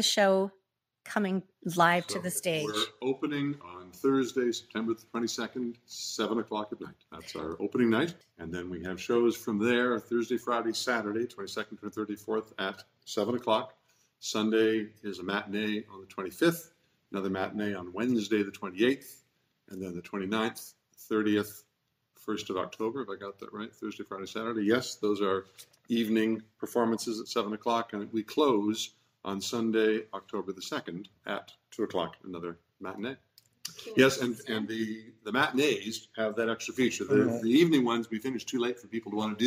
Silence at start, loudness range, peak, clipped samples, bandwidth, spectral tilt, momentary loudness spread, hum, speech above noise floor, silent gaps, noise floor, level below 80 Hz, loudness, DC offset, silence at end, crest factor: 0 s; 6 LU; -10 dBFS; under 0.1%; 16 kHz; -4.5 dB/octave; 14 LU; none; 44 dB; none; -75 dBFS; -72 dBFS; -31 LUFS; under 0.1%; 0 s; 22 dB